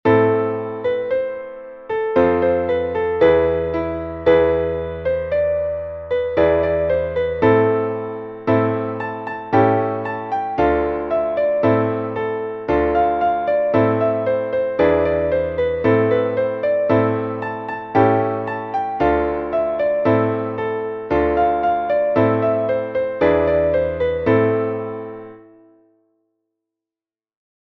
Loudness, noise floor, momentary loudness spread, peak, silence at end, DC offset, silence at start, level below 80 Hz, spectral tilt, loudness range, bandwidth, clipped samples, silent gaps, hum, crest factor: -19 LUFS; under -90 dBFS; 9 LU; -2 dBFS; 2.25 s; under 0.1%; 0.05 s; -42 dBFS; -9.5 dB/octave; 2 LU; 6 kHz; under 0.1%; none; none; 16 dB